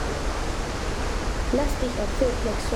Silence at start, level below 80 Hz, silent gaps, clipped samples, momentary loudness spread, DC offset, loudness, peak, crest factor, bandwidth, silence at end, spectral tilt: 0 s; -28 dBFS; none; under 0.1%; 4 LU; under 0.1%; -27 LUFS; -10 dBFS; 16 dB; 16 kHz; 0 s; -5 dB/octave